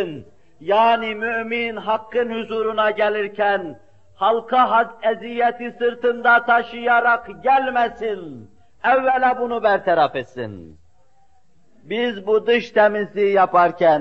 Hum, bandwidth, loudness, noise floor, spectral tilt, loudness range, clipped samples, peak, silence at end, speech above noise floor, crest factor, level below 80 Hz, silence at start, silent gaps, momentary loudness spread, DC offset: none; 6.8 kHz; -19 LUFS; -61 dBFS; -6 dB/octave; 4 LU; under 0.1%; -4 dBFS; 0 s; 42 dB; 16 dB; -62 dBFS; 0 s; none; 11 LU; 0.4%